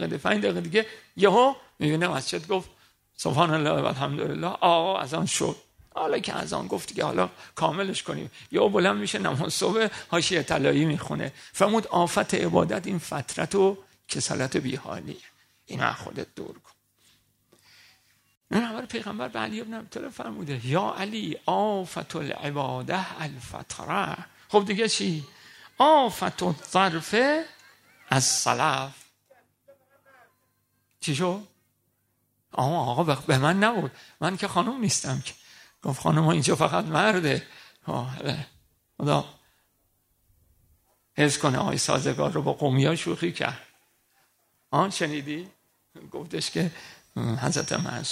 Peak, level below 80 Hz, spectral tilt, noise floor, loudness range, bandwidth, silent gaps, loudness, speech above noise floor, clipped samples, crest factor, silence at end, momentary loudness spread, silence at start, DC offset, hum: -4 dBFS; -62 dBFS; -4.5 dB/octave; -72 dBFS; 9 LU; 15.5 kHz; 18.37-18.41 s; -26 LUFS; 46 dB; under 0.1%; 24 dB; 0 s; 14 LU; 0 s; under 0.1%; none